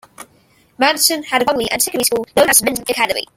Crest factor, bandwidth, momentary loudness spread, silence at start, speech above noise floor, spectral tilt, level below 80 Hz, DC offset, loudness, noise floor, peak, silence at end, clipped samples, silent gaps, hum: 18 dB; 17 kHz; 6 LU; 0.2 s; 38 dB; -1 dB/octave; -52 dBFS; under 0.1%; -15 LUFS; -54 dBFS; 0 dBFS; 0.15 s; under 0.1%; none; none